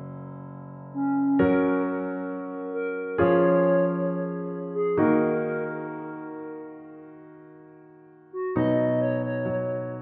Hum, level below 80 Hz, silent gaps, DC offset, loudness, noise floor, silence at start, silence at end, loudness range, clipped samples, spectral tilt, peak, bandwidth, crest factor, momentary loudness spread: none; -60 dBFS; none; under 0.1%; -25 LUFS; -51 dBFS; 0 s; 0 s; 7 LU; under 0.1%; -8 dB/octave; -10 dBFS; 4.1 kHz; 16 dB; 19 LU